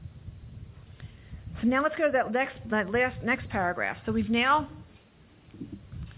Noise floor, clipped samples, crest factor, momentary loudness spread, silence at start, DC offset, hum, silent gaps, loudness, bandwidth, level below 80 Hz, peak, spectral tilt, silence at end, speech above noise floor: -57 dBFS; under 0.1%; 16 dB; 22 LU; 0 s; under 0.1%; none; none; -27 LUFS; 4 kHz; -50 dBFS; -14 dBFS; -3.5 dB/octave; 0.05 s; 30 dB